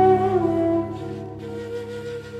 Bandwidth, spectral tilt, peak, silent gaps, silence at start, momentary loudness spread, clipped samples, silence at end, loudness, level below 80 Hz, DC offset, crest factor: 9.2 kHz; -8.5 dB/octave; -6 dBFS; none; 0 s; 14 LU; under 0.1%; 0 s; -24 LUFS; -50 dBFS; under 0.1%; 16 dB